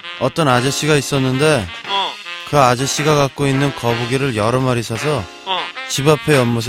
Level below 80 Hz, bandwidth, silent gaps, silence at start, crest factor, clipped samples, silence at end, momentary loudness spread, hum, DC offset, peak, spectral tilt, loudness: -46 dBFS; 16.5 kHz; none; 0.05 s; 16 dB; under 0.1%; 0 s; 7 LU; none; under 0.1%; 0 dBFS; -4.5 dB/octave; -16 LUFS